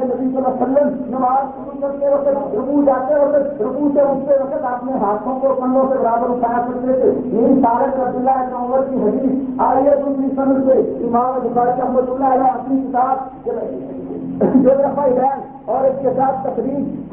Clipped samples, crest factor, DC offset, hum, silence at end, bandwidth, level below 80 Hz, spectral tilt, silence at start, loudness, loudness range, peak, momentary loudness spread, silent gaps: under 0.1%; 14 dB; under 0.1%; none; 0 s; 3.1 kHz; -50 dBFS; -12.5 dB/octave; 0 s; -17 LUFS; 1 LU; -2 dBFS; 7 LU; none